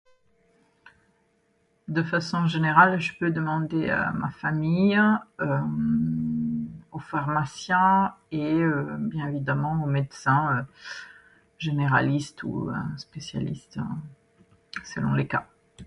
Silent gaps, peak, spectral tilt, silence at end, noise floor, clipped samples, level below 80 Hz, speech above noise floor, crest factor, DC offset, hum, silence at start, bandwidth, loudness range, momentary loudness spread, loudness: none; -4 dBFS; -7 dB/octave; 0 s; -68 dBFS; under 0.1%; -56 dBFS; 43 dB; 22 dB; under 0.1%; none; 1.9 s; 11 kHz; 6 LU; 15 LU; -25 LUFS